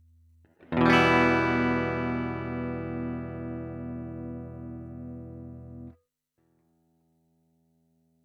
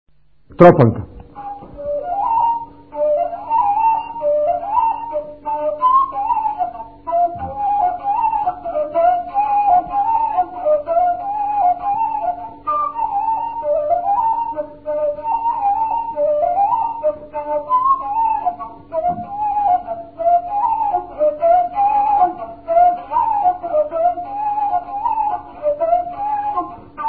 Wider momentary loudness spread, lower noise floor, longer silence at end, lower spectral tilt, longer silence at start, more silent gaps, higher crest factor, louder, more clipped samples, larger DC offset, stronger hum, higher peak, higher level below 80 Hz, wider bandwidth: first, 23 LU vs 10 LU; first, -74 dBFS vs -47 dBFS; first, 2.35 s vs 0 s; second, -6.5 dB/octave vs -10.5 dB/octave; about the same, 0.6 s vs 0.5 s; neither; first, 24 dB vs 18 dB; second, -27 LUFS vs -18 LUFS; neither; second, under 0.1% vs 0.4%; neither; second, -6 dBFS vs 0 dBFS; second, -56 dBFS vs -48 dBFS; first, 12 kHz vs 4.7 kHz